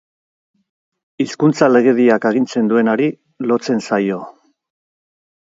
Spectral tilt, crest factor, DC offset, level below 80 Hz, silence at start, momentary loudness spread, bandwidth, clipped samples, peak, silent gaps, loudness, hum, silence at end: -6.5 dB/octave; 16 dB; under 0.1%; -66 dBFS; 1.2 s; 11 LU; 7.8 kHz; under 0.1%; 0 dBFS; none; -16 LUFS; none; 1.2 s